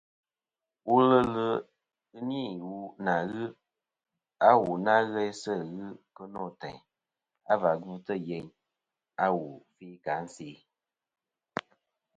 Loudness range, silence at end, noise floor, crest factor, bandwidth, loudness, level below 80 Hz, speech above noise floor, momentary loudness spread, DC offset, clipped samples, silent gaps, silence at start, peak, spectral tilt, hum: 8 LU; 0.55 s; under -90 dBFS; 24 dB; 9.2 kHz; -29 LUFS; -68 dBFS; over 61 dB; 21 LU; under 0.1%; under 0.1%; none; 0.85 s; -6 dBFS; -6.5 dB/octave; none